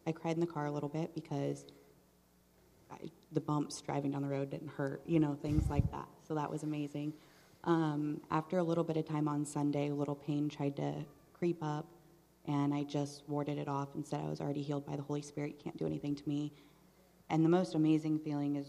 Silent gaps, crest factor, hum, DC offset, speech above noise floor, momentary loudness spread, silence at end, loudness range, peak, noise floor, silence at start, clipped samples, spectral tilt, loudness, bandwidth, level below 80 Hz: none; 20 dB; none; under 0.1%; 32 dB; 10 LU; 0 s; 5 LU; -16 dBFS; -68 dBFS; 0.05 s; under 0.1%; -7.5 dB/octave; -37 LUFS; 13.5 kHz; -56 dBFS